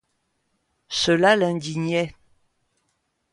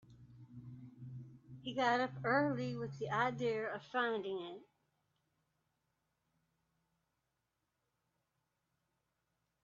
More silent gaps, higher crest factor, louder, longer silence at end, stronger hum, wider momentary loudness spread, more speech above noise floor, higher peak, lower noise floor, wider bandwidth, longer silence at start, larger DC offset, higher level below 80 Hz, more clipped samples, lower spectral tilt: neither; about the same, 20 dB vs 24 dB; first, -21 LUFS vs -37 LUFS; second, 1.2 s vs 5 s; neither; second, 11 LU vs 20 LU; about the same, 52 dB vs 49 dB; first, -6 dBFS vs -20 dBFS; second, -73 dBFS vs -86 dBFS; first, 11.5 kHz vs 7.4 kHz; first, 0.9 s vs 0.1 s; neither; first, -60 dBFS vs -78 dBFS; neither; about the same, -4.5 dB/octave vs -4 dB/octave